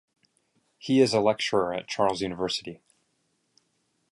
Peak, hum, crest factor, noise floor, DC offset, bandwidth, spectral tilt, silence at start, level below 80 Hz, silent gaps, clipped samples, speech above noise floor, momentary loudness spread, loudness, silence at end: -8 dBFS; none; 20 dB; -73 dBFS; under 0.1%; 11.5 kHz; -4.5 dB/octave; 0.85 s; -64 dBFS; none; under 0.1%; 48 dB; 10 LU; -26 LUFS; 1.4 s